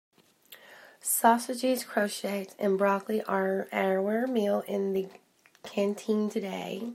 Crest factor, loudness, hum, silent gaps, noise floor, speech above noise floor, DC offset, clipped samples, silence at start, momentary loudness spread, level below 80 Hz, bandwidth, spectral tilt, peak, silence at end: 22 dB; -29 LUFS; none; none; -56 dBFS; 27 dB; under 0.1%; under 0.1%; 0.5 s; 11 LU; -82 dBFS; 16 kHz; -4.5 dB/octave; -8 dBFS; 0 s